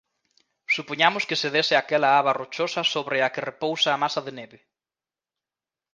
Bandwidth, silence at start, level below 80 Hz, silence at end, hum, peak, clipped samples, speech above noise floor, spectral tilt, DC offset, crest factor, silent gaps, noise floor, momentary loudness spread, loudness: 9.8 kHz; 0.7 s; -76 dBFS; 1.5 s; none; -2 dBFS; under 0.1%; over 66 dB; -3 dB/octave; under 0.1%; 24 dB; none; under -90 dBFS; 9 LU; -23 LUFS